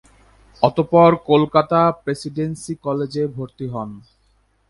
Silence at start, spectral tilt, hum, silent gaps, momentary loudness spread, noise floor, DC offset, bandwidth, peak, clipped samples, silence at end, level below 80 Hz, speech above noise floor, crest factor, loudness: 0.6 s; -7 dB/octave; none; none; 15 LU; -61 dBFS; under 0.1%; 11.5 kHz; 0 dBFS; under 0.1%; 0.7 s; -52 dBFS; 43 dB; 18 dB; -18 LUFS